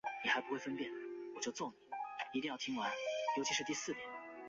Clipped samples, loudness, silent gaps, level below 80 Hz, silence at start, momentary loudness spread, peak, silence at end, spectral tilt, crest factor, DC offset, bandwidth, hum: under 0.1%; -41 LUFS; none; -82 dBFS; 0.05 s; 9 LU; -22 dBFS; 0 s; -1 dB/octave; 20 dB; under 0.1%; 7.6 kHz; none